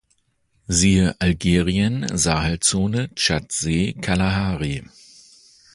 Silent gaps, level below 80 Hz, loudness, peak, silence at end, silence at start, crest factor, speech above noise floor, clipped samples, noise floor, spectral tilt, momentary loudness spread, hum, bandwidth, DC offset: none; -36 dBFS; -20 LUFS; -2 dBFS; 0.9 s; 0.7 s; 18 dB; 46 dB; under 0.1%; -66 dBFS; -4 dB/octave; 6 LU; none; 11.5 kHz; under 0.1%